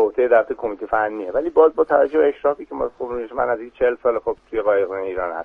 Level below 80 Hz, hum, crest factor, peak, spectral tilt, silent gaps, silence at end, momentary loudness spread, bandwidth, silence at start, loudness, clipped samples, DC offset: -50 dBFS; none; 18 dB; -2 dBFS; -7.5 dB/octave; none; 0 s; 10 LU; 3.7 kHz; 0 s; -20 LUFS; under 0.1%; under 0.1%